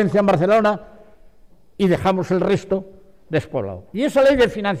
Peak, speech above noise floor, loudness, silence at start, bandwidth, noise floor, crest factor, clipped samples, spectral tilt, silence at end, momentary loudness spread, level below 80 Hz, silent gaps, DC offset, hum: -8 dBFS; 34 dB; -19 LUFS; 0 s; 15 kHz; -52 dBFS; 12 dB; under 0.1%; -7 dB/octave; 0 s; 11 LU; -46 dBFS; none; 0.4%; none